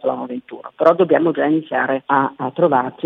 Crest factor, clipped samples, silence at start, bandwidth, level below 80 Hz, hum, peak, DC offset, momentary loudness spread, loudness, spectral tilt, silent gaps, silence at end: 18 dB; under 0.1%; 0.05 s; 5.8 kHz; -72 dBFS; none; 0 dBFS; under 0.1%; 13 LU; -17 LUFS; -8.5 dB/octave; none; 0 s